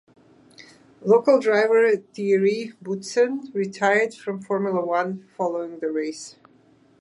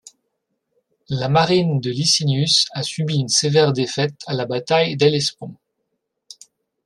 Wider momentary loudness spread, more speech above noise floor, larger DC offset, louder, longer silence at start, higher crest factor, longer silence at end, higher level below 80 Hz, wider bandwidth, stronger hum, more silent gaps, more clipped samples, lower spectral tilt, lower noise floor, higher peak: first, 13 LU vs 9 LU; second, 35 dB vs 56 dB; neither; second, -22 LUFS vs -18 LUFS; second, 0.6 s vs 1.1 s; about the same, 16 dB vs 18 dB; second, 0.7 s vs 1.3 s; second, -76 dBFS vs -60 dBFS; about the same, 11 kHz vs 12 kHz; neither; neither; neither; first, -5.5 dB/octave vs -4 dB/octave; second, -57 dBFS vs -75 dBFS; second, -6 dBFS vs -2 dBFS